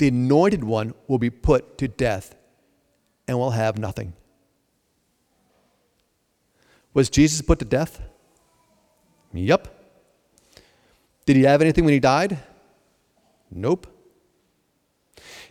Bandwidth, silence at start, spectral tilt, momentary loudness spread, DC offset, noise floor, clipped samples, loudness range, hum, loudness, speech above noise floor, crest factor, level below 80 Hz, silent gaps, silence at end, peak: 15 kHz; 0 s; -6 dB/octave; 17 LU; under 0.1%; -69 dBFS; under 0.1%; 9 LU; none; -21 LUFS; 49 dB; 20 dB; -38 dBFS; none; 0.1 s; -4 dBFS